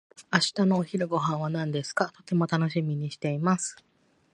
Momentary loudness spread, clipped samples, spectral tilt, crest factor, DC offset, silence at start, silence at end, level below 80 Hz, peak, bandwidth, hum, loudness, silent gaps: 6 LU; under 0.1%; -5 dB/octave; 20 dB; under 0.1%; 0.2 s; 0.6 s; -70 dBFS; -8 dBFS; 11 kHz; none; -27 LUFS; none